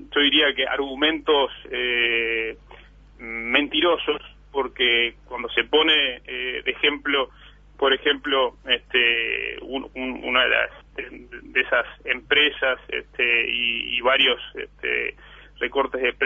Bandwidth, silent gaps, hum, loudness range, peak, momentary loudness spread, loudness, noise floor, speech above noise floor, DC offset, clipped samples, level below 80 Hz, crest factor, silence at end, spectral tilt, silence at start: 7 kHz; none; none; 2 LU; -4 dBFS; 13 LU; -21 LUFS; -47 dBFS; 24 dB; under 0.1%; under 0.1%; -50 dBFS; 18 dB; 0 s; -4.5 dB/octave; 0 s